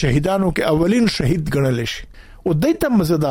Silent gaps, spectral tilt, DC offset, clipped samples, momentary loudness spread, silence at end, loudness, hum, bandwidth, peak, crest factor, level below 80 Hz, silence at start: none; -6.5 dB/octave; under 0.1%; under 0.1%; 7 LU; 0 s; -18 LUFS; none; 17 kHz; -6 dBFS; 12 dB; -34 dBFS; 0 s